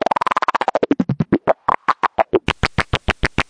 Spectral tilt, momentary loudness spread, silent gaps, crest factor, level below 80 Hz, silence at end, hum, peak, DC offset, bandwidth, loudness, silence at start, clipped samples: -6 dB/octave; 2 LU; none; 18 dB; -34 dBFS; 0.05 s; none; -2 dBFS; under 0.1%; 10.5 kHz; -19 LUFS; 0.35 s; under 0.1%